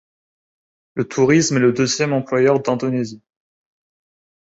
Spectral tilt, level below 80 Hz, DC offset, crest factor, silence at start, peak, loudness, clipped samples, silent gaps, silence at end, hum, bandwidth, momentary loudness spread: -5 dB/octave; -58 dBFS; under 0.1%; 18 dB; 0.95 s; -2 dBFS; -17 LUFS; under 0.1%; none; 1.25 s; none; 8.2 kHz; 11 LU